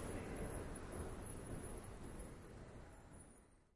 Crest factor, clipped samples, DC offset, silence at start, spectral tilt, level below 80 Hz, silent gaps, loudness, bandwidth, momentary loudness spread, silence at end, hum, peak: 16 dB; under 0.1%; under 0.1%; 0 s; -5.5 dB/octave; -56 dBFS; none; -52 LUFS; 11.5 kHz; 13 LU; 0.05 s; none; -34 dBFS